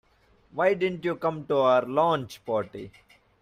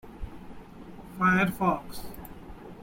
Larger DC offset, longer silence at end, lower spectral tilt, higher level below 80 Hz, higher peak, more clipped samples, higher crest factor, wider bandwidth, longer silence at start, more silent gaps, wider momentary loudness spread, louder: neither; first, 0.55 s vs 0 s; about the same, -6.5 dB/octave vs -6.5 dB/octave; second, -66 dBFS vs -48 dBFS; about the same, -10 dBFS vs -12 dBFS; neither; about the same, 18 dB vs 18 dB; second, 14.5 kHz vs 16.5 kHz; first, 0.55 s vs 0.05 s; neither; second, 17 LU vs 24 LU; about the same, -26 LUFS vs -26 LUFS